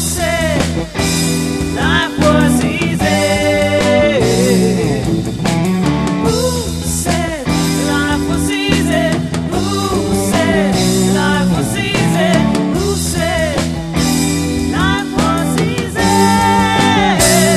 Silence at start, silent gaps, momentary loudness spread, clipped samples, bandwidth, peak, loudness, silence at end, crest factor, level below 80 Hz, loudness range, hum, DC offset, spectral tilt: 0 s; none; 5 LU; under 0.1%; 13.5 kHz; 0 dBFS; -14 LUFS; 0 s; 14 dB; -28 dBFS; 3 LU; none; under 0.1%; -4.5 dB/octave